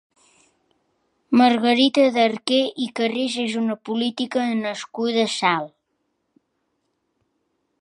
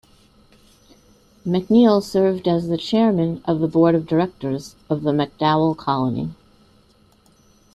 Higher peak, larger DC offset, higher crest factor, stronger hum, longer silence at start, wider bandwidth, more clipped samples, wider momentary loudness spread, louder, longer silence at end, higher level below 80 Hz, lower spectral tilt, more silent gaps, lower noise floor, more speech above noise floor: about the same, -4 dBFS vs -4 dBFS; neither; about the same, 20 dB vs 18 dB; neither; second, 1.3 s vs 1.45 s; second, 11 kHz vs 12.5 kHz; neither; second, 9 LU vs 12 LU; about the same, -21 LUFS vs -19 LUFS; first, 2.15 s vs 1.4 s; second, -76 dBFS vs -54 dBFS; second, -4 dB/octave vs -7.5 dB/octave; neither; first, -73 dBFS vs -55 dBFS; first, 53 dB vs 37 dB